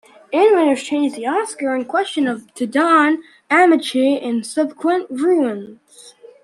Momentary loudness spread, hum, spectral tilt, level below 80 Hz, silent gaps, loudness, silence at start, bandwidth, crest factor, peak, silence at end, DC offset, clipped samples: 9 LU; none; -4 dB/octave; -70 dBFS; none; -17 LUFS; 0.3 s; 12.5 kHz; 16 dB; -2 dBFS; 0.35 s; under 0.1%; under 0.1%